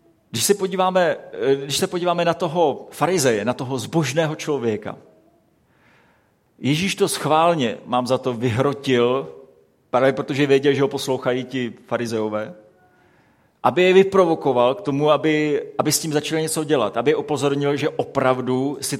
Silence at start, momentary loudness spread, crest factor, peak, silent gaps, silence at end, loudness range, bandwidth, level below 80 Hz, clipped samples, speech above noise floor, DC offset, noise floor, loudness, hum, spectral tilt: 0.35 s; 7 LU; 20 dB; 0 dBFS; none; 0 s; 5 LU; 16.5 kHz; -62 dBFS; under 0.1%; 41 dB; under 0.1%; -60 dBFS; -20 LUFS; none; -4.5 dB/octave